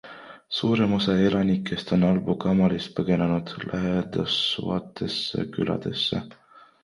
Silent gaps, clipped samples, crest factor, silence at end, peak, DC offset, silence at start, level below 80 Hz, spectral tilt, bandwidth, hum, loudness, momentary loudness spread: none; under 0.1%; 16 dB; 0.55 s; -8 dBFS; under 0.1%; 0.05 s; -52 dBFS; -7 dB/octave; 11 kHz; none; -25 LUFS; 8 LU